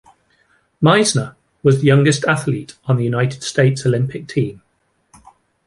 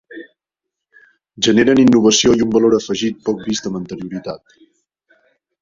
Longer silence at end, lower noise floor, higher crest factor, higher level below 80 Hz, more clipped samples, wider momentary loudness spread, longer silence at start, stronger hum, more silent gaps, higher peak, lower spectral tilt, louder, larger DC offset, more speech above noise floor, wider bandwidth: about the same, 1.15 s vs 1.25 s; second, -60 dBFS vs -82 dBFS; about the same, 16 dB vs 16 dB; about the same, -54 dBFS vs -50 dBFS; neither; second, 10 LU vs 19 LU; first, 0.8 s vs 0.1 s; neither; neither; about the same, -2 dBFS vs -2 dBFS; first, -5.5 dB/octave vs -4 dB/octave; about the same, -17 LUFS vs -15 LUFS; neither; second, 45 dB vs 68 dB; first, 11.5 kHz vs 7.6 kHz